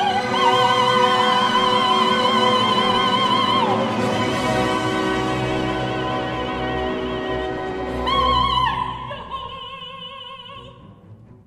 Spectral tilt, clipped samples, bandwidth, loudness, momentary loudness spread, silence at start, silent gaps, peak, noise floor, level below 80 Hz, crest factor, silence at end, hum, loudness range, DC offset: -4.5 dB/octave; under 0.1%; 14 kHz; -19 LUFS; 16 LU; 0 s; none; -4 dBFS; -44 dBFS; -40 dBFS; 16 dB; 0.3 s; none; 7 LU; under 0.1%